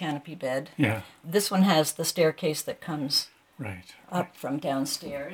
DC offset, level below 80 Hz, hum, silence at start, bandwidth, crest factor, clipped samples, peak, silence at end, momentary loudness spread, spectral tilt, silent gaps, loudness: under 0.1%; -68 dBFS; none; 0 s; 18.5 kHz; 20 dB; under 0.1%; -8 dBFS; 0 s; 16 LU; -4.5 dB/octave; none; -27 LUFS